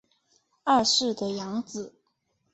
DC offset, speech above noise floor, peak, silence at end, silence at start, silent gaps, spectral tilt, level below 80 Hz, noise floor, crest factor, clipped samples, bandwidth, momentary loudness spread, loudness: under 0.1%; 48 dB; -10 dBFS; 0.65 s; 0.65 s; none; -2.5 dB/octave; -66 dBFS; -74 dBFS; 20 dB; under 0.1%; 8.2 kHz; 17 LU; -25 LUFS